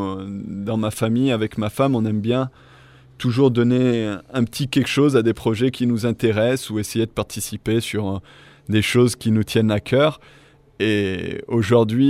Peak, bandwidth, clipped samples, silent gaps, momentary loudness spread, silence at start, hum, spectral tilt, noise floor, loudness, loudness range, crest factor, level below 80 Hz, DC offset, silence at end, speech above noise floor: -4 dBFS; 16 kHz; under 0.1%; none; 10 LU; 0 s; none; -6 dB/octave; -48 dBFS; -20 LUFS; 3 LU; 16 dB; -50 dBFS; under 0.1%; 0 s; 28 dB